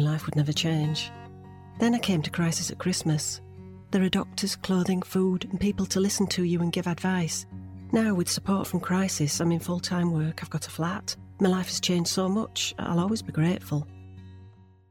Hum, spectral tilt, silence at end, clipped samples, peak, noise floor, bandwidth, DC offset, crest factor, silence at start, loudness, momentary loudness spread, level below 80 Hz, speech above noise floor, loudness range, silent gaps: none; -5 dB/octave; 0.4 s; under 0.1%; -8 dBFS; -52 dBFS; 17.5 kHz; under 0.1%; 18 dB; 0 s; -27 LUFS; 10 LU; -56 dBFS; 25 dB; 1 LU; none